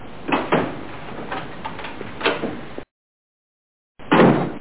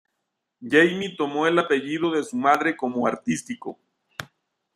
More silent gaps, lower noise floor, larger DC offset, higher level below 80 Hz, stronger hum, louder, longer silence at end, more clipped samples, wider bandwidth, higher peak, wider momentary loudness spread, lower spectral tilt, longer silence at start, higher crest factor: first, 2.91-3.95 s vs none; first, under -90 dBFS vs -79 dBFS; first, 2% vs under 0.1%; first, -50 dBFS vs -70 dBFS; neither; about the same, -21 LUFS vs -22 LUFS; second, 0 s vs 0.5 s; neither; second, 4 kHz vs 14 kHz; about the same, -2 dBFS vs -4 dBFS; about the same, 19 LU vs 20 LU; first, -10 dB/octave vs -4.5 dB/octave; second, 0 s vs 0.6 s; about the same, 22 dB vs 20 dB